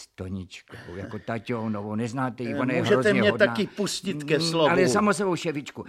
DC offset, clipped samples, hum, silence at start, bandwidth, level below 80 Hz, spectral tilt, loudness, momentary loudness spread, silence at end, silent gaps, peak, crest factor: under 0.1%; under 0.1%; none; 0 s; 15 kHz; -62 dBFS; -5 dB/octave; -24 LUFS; 16 LU; 0 s; none; -6 dBFS; 20 dB